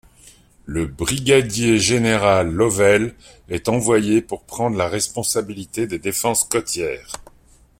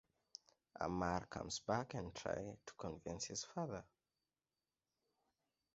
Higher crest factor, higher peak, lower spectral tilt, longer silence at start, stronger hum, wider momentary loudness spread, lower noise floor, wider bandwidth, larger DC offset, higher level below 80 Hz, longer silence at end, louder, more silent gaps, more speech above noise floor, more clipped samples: second, 18 dB vs 24 dB; first, 0 dBFS vs -24 dBFS; about the same, -4 dB/octave vs -4.5 dB/octave; about the same, 0.65 s vs 0.75 s; neither; second, 12 LU vs 18 LU; second, -52 dBFS vs under -90 dBFS; first, 16.5 kHz vs 7.6 kHz; neither; first, -44 dBFS vs -66 dBFS; second, 0.6 s vs 1.9 s; first, -19 LUFS vs -45 LUFS; neither; second, 33 dB vs over 45 dB; neither